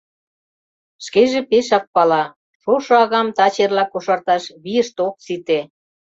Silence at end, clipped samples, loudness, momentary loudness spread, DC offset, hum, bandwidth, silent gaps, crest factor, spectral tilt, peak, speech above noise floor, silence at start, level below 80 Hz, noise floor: 0.5 s; under 0.1%; -17 LUFS; 8 LU; under 0.1%; none; 7.8 kHz; 1.87-1.93 s, 2.36-2.60 s; 16 dB; -4 dB/octave; -2 dBFS; over 73 dB; 1 s; -64 dBFS; under -90 dBFS